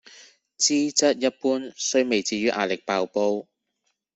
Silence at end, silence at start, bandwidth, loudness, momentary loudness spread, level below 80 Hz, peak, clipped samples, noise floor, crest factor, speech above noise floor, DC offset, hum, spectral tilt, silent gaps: 0.75 s; 0.2 s; 8.4 kHz; -23 LUFS; 6 LU; -68 dBFS; -6 dBFS; under 0.1%; -76 dBFS; 18 dB; 52 dB; under 0.1%; none; -2 dB/octave; none